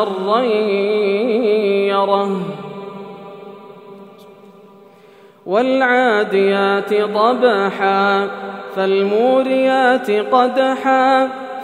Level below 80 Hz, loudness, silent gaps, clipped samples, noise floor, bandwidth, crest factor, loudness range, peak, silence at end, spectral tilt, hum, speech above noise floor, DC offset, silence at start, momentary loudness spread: -78 dBFS; -15 LUFS; none; under 0.1%; -45 dBFS; 10 kHz; 16 dB; 9 LU; 0 dBFS; 0 s; -6 dB/octave; none; 30 dB; under 0.1%; 0 s; 16 LU